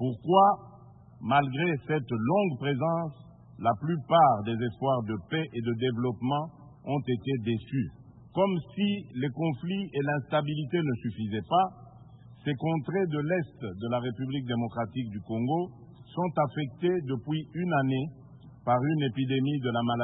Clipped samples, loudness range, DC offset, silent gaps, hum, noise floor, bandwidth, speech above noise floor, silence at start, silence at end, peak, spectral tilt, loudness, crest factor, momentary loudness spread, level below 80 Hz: under 0.1%; 4 LU; under 0.1%; none; none; -52 dBFS; 4 kHz; 24 dB; 0 s; 0 s; -8 dBFS; -11 dB/octave; -29 LUFS; 22 dB; 9 LU; -62 dBFS